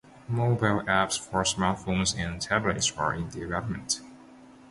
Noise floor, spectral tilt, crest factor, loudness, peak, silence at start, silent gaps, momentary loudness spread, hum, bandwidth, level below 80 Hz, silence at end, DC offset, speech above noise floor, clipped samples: -51 dBFS; -4 dB/octave; 20 dB; -27 LUFS; -8 dBFS; 0.05 s; none; 7 LU; none; 11.5 kHz; -48 dBFS; 0.05 s; under 0.1%; 23 dB; under 0.1%